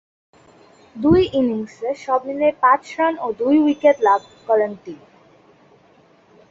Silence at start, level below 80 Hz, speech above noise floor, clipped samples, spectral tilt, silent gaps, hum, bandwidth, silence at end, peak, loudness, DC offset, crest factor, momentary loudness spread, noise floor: 0.95 s; -48 dBFS; 35 dB; under 0.1%; -7 dB/octave; none; none; 7.8 kHz; 1.55 s; -2 dBFS; -18 LUFS; under 0.1%; 18 dB; 10 LU; -53 dBFS